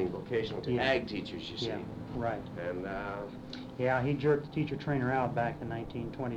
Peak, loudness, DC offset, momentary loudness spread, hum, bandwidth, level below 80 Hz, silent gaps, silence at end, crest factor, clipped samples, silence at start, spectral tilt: -16 dBFS; -34 LUFS; under 0.1%; 10 LU; none; 9.8 kHz; -56 dBFS; none; 0 s; 18 dB; under 0.1%; 0 s; -7 dB/octave